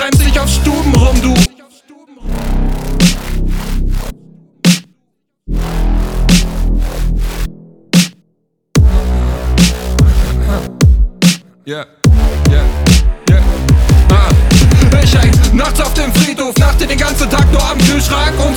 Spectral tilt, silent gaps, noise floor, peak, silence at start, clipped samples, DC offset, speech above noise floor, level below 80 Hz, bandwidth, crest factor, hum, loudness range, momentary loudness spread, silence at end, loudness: -5 dB/octave; none; -65 dBFS; 0 dBFS; 0 s; under 0.1%; under 0.1%; 54 dB; -12 dBFS; 19 kHz; 10 dB; none; 7 LU; 11 LU; 0 s; -12 LUFS